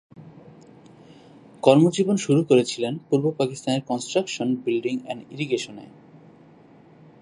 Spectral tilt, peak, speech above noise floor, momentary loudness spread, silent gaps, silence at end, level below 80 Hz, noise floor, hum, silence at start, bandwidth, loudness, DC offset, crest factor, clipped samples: -6 dB/octave; -2 dBFS; 29 dB; 12 LU; none; 1.35 s; -70 dBFS; -51 dBFS; none; 0.2 s; 11.5 kHz; -22 LUFS; under 0.1%; 22 dB; under 0.1%